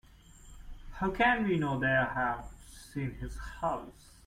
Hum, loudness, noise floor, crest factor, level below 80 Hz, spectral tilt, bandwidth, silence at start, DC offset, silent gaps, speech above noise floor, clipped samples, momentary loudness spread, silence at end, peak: none; -32 LUFS; -55 dBFS; 20 dB; -48 dBFS; -6 dB/octave; 16 kHz; 0.1 s; under 0.1%; none; 23 dB; under 0.1%; 22 LU; 0.35 s; -14 dBFS